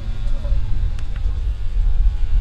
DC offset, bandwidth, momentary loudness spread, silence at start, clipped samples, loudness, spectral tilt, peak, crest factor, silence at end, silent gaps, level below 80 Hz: under 0.1%; 5 kHz; 5 LU; 0 s; under 0.1%; -25 LUFS; -7 dB/octave; -6 dBFS; 12 dB; 0 s; none; -18 dBFS